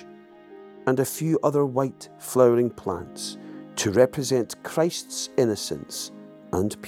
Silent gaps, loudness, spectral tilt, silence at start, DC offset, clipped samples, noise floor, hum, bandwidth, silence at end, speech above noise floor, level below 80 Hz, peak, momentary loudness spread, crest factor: none; -25 LUFS; -5 dB/octave; 0 s; under 0.1%; under 0.1%; -47 dBFS; none; 17 kHz; 0 s; 23 dB; -60 dBFS; -4 dBFS; 14 LU; 20 dB